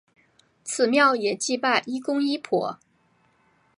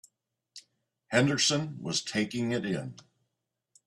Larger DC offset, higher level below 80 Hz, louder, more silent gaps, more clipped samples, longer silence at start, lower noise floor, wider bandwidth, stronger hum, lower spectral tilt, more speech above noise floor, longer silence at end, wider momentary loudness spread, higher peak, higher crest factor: neither; second, -80 dBFS vs -68 dBFS; first, -23 LUFS vs -29 LUFS; neither; neither; about the same, 0.65 s vs 0.55 s; second, -64 dBFS vs -84 dBFS; about the same, 11.5 kHz vs 12.5 kHz; neither; about the same, -3 dB/octave vs -3.5 dB/octave; second, 41 dB vs 55 dB; about the same, 1 s vs 0.95 s; about the same, 12 LU vs 10 LU; first, -6 dBFS vs -10 dBFS; about the same, 18 dB vs 22 dB